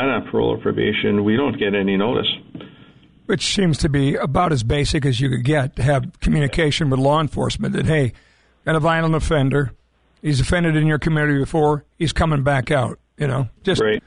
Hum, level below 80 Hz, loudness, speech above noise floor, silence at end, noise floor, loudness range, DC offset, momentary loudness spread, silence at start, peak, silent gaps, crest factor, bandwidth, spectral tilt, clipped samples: none; -34 dBFS; -19 LUFS; 30 dB; 0.05 s; -48 dBFS; 1 LU; 0.3%; 5 LU; 0 s; -8 dBFS; none; 12 dB; 11 kHz; -6 dB/octave; under 0.1%